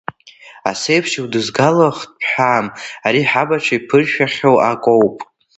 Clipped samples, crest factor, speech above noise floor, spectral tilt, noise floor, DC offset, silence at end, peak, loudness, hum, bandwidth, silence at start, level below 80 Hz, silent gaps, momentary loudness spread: under 0.1%; 16 dB; 27 dB; -5 dB/octave; -42 dBFS; under 0.1%; 0.35 s; 0 dBFS; -15 LUFS; none; 8.2 kHz; 0.45 s; -58 dBFS; none; 9 LU